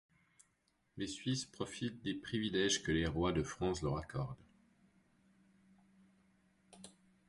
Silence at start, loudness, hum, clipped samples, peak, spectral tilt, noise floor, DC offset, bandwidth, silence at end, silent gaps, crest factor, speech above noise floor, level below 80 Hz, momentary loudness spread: 0.95 s; -38 LUFS; none; under 0.1%; -22 dBFS; -4.5 dB/octave; -79 dBFS; under 0.1%; 11.5 kHz; 0.4 s; none; 20 dB; 41 dB; -56 dBFS; 23 LU